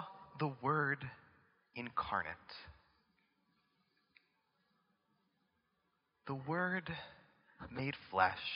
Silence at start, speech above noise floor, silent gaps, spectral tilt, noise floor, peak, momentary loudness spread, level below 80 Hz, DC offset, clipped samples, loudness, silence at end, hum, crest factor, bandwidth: 0 s; 43 dB; none; -3.5 dB/octave; -82 dBFS; -16 dBFS; 19 LU; -72 dBFS; under 0.1%; under 0.1%; -39 LUFS; 0 s; none; 26 dB; 5.4 kHz